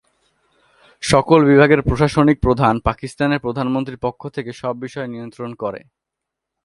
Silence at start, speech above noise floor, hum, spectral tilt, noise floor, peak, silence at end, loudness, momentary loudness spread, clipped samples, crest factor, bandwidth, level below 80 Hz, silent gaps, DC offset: 1 s; 65 dB; none; -6.5 dB/octave; -82 dBFS; 0 dBFS; 0.85 s; -17 LUFS; 16 LU; under 0.1%; 18 dB; 11.5 kHz; -36 dBFS; none; under 0.1%